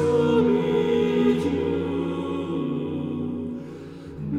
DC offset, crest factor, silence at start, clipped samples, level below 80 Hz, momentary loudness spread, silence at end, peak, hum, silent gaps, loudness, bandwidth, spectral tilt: under 0.1%; 14 dB; 0 s; under 0.1%; -54 dBFS; 15 LU; 0 s; -8 dBFS; none; none; -24 LUFS; 10.5 kHz; -8 dB/octave